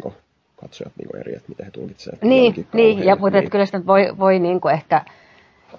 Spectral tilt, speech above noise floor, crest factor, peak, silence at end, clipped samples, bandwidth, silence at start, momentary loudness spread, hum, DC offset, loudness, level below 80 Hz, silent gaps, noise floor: -7.5 dB/octave; 35 dB; 16 dB; -2 dBFS; 0.75 s; under 0.1%; 7 kHz; 0.05 s; 20 LU; none; under 0.1%; -16 LUFS; -58 dBFS; none; -53 dBFS